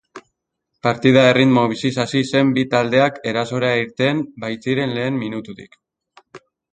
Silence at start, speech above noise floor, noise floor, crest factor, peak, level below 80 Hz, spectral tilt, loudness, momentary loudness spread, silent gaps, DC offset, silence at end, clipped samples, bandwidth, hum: 0.15 s; 58 dB; -76 dBFS; 18 dB; 0 dBFS; -58 dBFS; -6 dB/octave; -18 LUFS; 12 LU; none; under 0.1%; 0.35 s; under 0.1%; 9.2 kHz; none